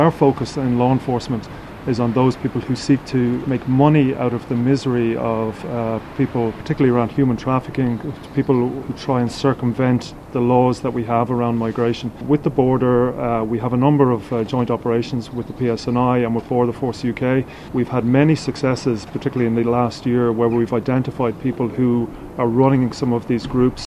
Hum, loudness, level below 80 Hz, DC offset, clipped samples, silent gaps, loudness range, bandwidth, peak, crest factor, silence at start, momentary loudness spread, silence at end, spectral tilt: none; -19 LUFS; -44 dBFS; under 0.1%; under 0.1%; none; 2 LU; 11 kHz; 0 dBFS; 18 dB; 0 s; 7 LU; 0.05 s; -8 dB/octave